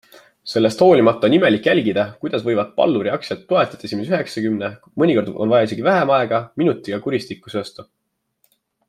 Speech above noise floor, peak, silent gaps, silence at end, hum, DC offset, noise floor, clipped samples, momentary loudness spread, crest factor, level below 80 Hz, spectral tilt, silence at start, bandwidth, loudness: 48 dB; -2 dBFS; none; 1.05 s; none; under 0.1%; -66 dBFS; under 0.1%; 12 LU; 16 dB; -62 dBFS; -6.5 dB/octave; 0.45 s; 13 kHz; -18 LUFS